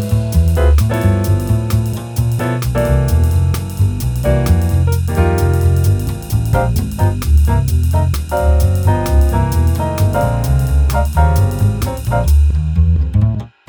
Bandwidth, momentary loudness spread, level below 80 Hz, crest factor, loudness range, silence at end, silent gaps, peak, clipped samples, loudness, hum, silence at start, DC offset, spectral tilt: over 20 kHz; 4 LU; -18 dBFS; 12 dB; 1 LU; 0.2 s; none; 0 dBFS; under 0.1%; -15 LUFS; none; 0 s; under 0.1%; -7 dB/octave